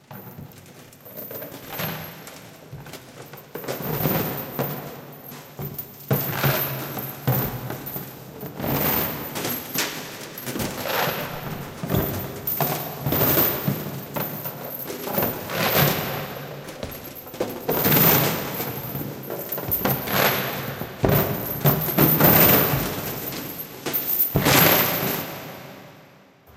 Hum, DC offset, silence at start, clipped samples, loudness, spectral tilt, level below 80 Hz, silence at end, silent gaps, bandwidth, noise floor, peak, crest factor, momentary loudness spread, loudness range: none; under 0.1%; 0.1 s; under 0.1%; -22 LUFS; -4.5 dB/octave; -48 dBFS; 0 s; none; 17 kHz; -51 dBFS; -2 dBFS; 22 dB; 21 LU; 11 LU